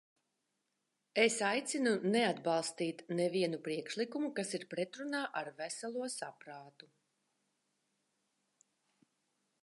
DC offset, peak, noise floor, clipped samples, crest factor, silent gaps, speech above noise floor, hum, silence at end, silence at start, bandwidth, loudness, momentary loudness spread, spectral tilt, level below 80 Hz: under 0.1%; -16 dBFS; -85 dBFS; under 0.1%; 24 dB; none; 48 dB; none; 2.95 s; 1.15 s; 11.5 kHz; -36 LUFS; 11 LU; -3.5 dB/octave; under -90 dBFS